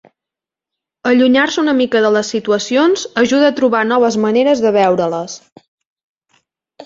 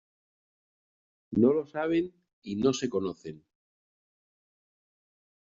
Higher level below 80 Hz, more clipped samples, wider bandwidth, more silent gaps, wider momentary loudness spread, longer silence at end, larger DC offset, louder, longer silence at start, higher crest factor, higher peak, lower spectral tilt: first, -60 dBFS vs -68 dBFS; neither; about the same, 7.8 kHz vs 7.6 kHz; first, 5.52-5.56 s, 5.68-5.78 s, 5.86-5.96 s, 6.03-6.16 s vs 2.33-2.42 s; second, 6 LU vs 18 LU; second, 0 s vs 2.2 s; neither; first, -13 LUFS vs -29 LUFS; second, 1.05 s vs 1.3 s; second, 14 dB vs 22 dB; first, -2 dBFS vs -10 dBFS; second, -4.5 dB/octave vs -6 dB/octave